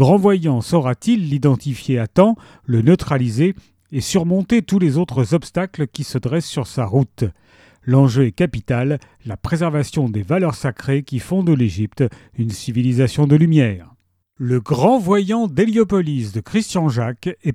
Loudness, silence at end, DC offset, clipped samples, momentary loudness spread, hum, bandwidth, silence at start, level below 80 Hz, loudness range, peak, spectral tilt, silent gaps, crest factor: -18 LUFS; 0 s; under 0.1%; under 0.1%; 9 LU; none; 14 kHz; 0 s; -46 dBFS; 3 LU; 0 dBFS; -7.5 dB/octave; none; 18 dB